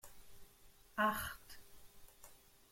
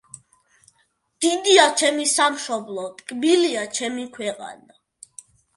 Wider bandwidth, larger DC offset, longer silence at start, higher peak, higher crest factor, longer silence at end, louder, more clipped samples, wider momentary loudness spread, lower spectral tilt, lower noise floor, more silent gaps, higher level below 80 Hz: first, 16.5 kHz vs 11.5 kHz; neither; second, 0.05 s vs 1.2 s; second, -22 dBFS vs 0 dBFS; about the same, 24 dB vs 22 dB; second, 0.15 s vs 1 s; second, -39 LUFS vs -20 LUFS; neither; first, 27 LU vs 17 LU; first, -3.5 dB/octave vs -1 dB/octave; about the same, -64 dBFS vs -67 dBFS; neither; first, -66 dBFS vs -72 dBFS